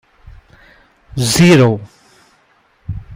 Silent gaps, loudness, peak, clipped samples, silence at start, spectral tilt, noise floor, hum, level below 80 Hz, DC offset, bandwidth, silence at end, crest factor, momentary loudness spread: none; -11 LUFS; 0 dBFS; under 0.1%; 1.15 s; -5.5 dB/octave; -55 dBFS; none; -40 dBFS; under 0.1%; 16 kHz; 0 s; 16 dB; 21 LU